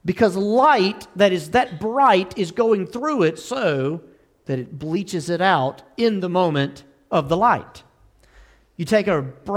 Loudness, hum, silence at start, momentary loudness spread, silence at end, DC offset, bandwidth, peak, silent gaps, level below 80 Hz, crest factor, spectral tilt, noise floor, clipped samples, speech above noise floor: -20 LUFS; none; 0.05 s; 11 LU; 0 s; under 0.1%; 15.5 kHz; -4 dBFS; none; -54 dBFS; 16 dB; -6 dB/octave; -54 dBFS; under 0.1%; 34 dB